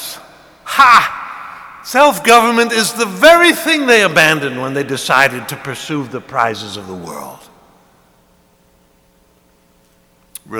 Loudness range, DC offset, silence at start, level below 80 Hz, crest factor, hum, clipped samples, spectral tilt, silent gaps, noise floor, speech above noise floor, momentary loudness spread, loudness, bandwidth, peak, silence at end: 14 LU; under 0.1%; 0 s; -54 dBFS; 14 dB; none; 0.6%; -3 dB/octave; none; -53 dBFS; 41 dB; 21 LU; -11 LUFS; over 20 kHz; 0 dBFS; 0 s